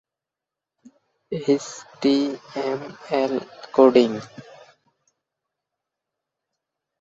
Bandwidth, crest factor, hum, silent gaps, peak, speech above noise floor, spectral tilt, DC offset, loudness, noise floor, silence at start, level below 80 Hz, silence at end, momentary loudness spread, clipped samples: 7.8 kHz; 22 dB; none; none; -2 dBFS; 66 dB; -5.5 dB/octave; under 0.1%; -22 LUFS; -87 dBFS; 1.3 s; -70 dBFS; 2.6 s; 17 LU; under 0.1%